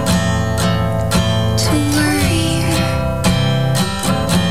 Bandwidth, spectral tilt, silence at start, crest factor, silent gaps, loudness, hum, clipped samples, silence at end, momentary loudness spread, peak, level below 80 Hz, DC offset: 16 kHz; -5 dB/octave; 0 s; 12 dB; none; -16 LUFS; none; under 0.1%; 0 s; 2 LU; -4 dBFS; -28 dBFS; 3%